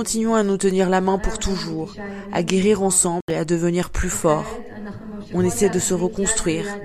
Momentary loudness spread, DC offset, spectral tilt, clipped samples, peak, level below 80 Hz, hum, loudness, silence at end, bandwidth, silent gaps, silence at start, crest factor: 14 LU; under 0.1%; -4.5 dB/octave; under 0.1%; 0 dBFS; -36 dBFS; none; -20 LUFS; 0 s; 14.5 kHz; 3.22-3.28 s; 0 s; 20 dB